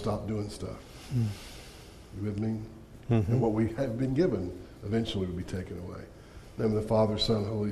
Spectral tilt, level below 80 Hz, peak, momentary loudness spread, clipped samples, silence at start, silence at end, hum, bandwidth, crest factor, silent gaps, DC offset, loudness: -7 dB/octave; -50 dBFS; -14 dBFS; 19 LU; under 0.1%; 0 s; 0 s; none; 13 kHz; 18 dB; none; under 0.1%; -31 LUFS